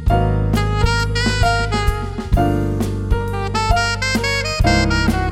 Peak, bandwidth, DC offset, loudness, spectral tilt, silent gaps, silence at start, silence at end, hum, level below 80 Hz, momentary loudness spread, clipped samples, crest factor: 0 dBFS; 16 kHz; under 0.1%; -18 LUFS; -5.5 dB/octave; none; 0 s; 0 s; none; -22 dBFS; 5 LU; under 0.1%; 16 dB